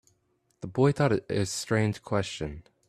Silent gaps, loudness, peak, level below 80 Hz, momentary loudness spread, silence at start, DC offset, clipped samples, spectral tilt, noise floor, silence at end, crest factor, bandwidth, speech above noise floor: none; -28 LUFS; -10 dBFS; -54 dBFS; 13 LU; 0.65 s; under 0.1%; under 0.1%; -5.5 dB/octave; -72 dBFS; 0.3 s; 18 dB; 14 kHz; 45 dB